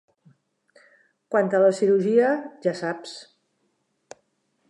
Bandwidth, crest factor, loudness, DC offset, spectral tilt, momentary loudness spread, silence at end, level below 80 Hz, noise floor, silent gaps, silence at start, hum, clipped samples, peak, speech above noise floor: 11 kHz; 18 dB; -22 LUFS; under 0.1%; -6 dB/octave; 16 LU; 1.45 s; -82 dBFS; -72 dBFS; none; 1.3 s; none; under 0.1%; -8 dBFS; 50 dB